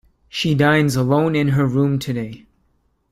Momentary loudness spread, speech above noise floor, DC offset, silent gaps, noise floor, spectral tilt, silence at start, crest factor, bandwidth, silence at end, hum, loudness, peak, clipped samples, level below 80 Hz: 11 LU; 46 dB; under 0.1%; none; -64 dBFS; -6.5 dB/octave; 0.35 s; 16 dB; 15 kHz; 0.75 s; none; -18 LUFS; -2 dBFS; under 0.1%; -50 dBFS